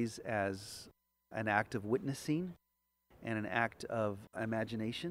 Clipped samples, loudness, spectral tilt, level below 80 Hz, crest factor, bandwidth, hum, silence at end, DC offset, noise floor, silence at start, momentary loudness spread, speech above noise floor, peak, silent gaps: under 0.1%; -38 LUFS; -5.5 dB/octave; -70 dBFS; 24 dB; 16 kHz; none; 0 s; under 0.1%; -75 dBFS; 0 s; 12 LU; 37 dB; -14 dBFS; none